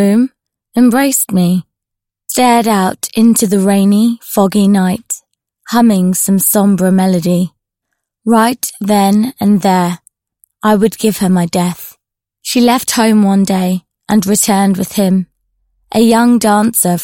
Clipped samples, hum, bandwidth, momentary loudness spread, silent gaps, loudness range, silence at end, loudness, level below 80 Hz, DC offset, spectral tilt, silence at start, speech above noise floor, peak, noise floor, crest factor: under 0.1%; none; 17 kHz; 9 LU; none; 2 LU; 0 s; -11 LUFS; -50 dBFS; under 0.1%; -5 dB/octave; 0 s; 70 dB; 0 dBFS; -80 dBFS; 12 dB